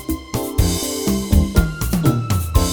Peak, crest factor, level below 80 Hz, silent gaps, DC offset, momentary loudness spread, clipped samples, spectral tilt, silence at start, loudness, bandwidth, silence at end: 0 dBFS; 18 dB; -22 dBFS; none; under 0.1%; 5 LU; under 0.1%; -5.5 dB/octave; 0 s; -19 LUFS; over 20 kHz; 0 s